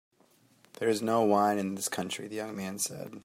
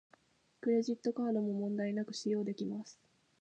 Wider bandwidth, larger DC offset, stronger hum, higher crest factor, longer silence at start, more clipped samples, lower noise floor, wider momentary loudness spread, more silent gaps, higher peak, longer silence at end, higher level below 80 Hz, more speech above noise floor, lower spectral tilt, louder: first, 16 kHz vs 9.2 kHz; neither; neither; first, 20 dB vs 14 dB; first, 0.8 s vs 0.65 s; neither; second, -65 dBFS vs -69 dBFS; first, 11 LU vs 8 LU; neither; first, -12 dBFS vs -22 dBFS; second, 0.05 s vs 0.45 s; first, -76 dBFS vs -86 dBFS; about the same, 35 dB vs 34 dB; second, -4 dB/octave vs -6.5 dB/octave; first, -30 LUFS vs -36 LUFS